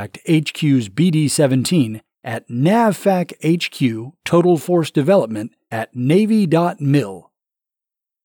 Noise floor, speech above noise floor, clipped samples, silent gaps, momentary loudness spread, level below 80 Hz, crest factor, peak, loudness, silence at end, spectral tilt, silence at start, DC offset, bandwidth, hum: -87 dBFS; 71 dB; under 0.1%; none; 12 LU; -64 dBFS; 14 dB; -4 dBFS; -17 LUFS; 1.05 s; -6 dB/octave; 0 s; under 0.1%; 19.5 kHz; none